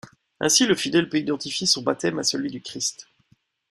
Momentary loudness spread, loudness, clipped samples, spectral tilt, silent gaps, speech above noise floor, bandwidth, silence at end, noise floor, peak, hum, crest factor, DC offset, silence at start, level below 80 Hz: 10 LU; -22 LUFS; under 0.1%; -2.5 dB/octave; none; 40 dB; 15.5 kHz; 0.7 s; -64 dBFS; -4 dBFS; none; 20 dB; under 0.1%; 0.05 s; -66 dBFS